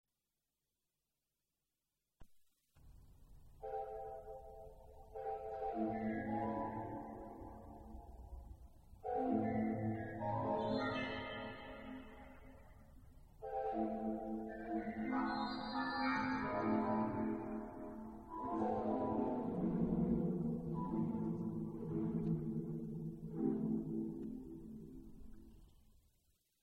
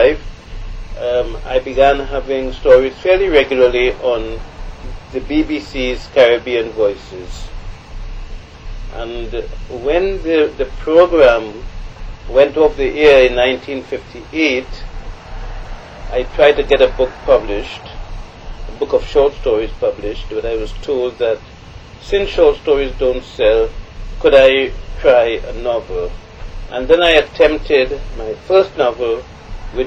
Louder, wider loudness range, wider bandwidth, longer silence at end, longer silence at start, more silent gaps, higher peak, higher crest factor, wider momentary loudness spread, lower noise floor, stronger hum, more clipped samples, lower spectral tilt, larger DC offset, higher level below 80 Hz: second, -41 LUFS vs -14 LUFS; about the same, 8 LU vs 6 LU; second, 6.6 kHz vs 7.8 kHz; first, 0.85 s vs 0 s; first, 2.2 s vs 0 s; neither; second, -24 dBFS vs 0 dBFS; about the same, 18 dB vs 16 dB; second, 18 LU vs 23 LU; first, under -90 dBFS vs -35 dBFS; neither; neither; first, -8.5 dB/octave vs -5.5 dB/octave; neither; second, -60 dBFS vs -28 dBFS